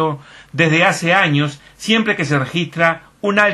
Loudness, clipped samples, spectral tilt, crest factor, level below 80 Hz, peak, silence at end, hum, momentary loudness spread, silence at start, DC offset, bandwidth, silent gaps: -16 LUFS; under 0.1%; -5 dB/octave; 16 dB; -56 dBFS; 0 dBFS; 0 s; none; 10 LU; 0 s; under 0.1%; 12.5 kHz; none